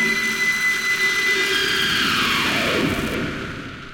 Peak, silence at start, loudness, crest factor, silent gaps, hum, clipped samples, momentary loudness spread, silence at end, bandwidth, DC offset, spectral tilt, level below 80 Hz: -8 dBFS; 0 s; -18 LUFS; 12 dB; none; none; under 0.1%; 9 LU; 0 s; 17 kHz; 0.1%; -2.5 dB/octave; -44 dBFS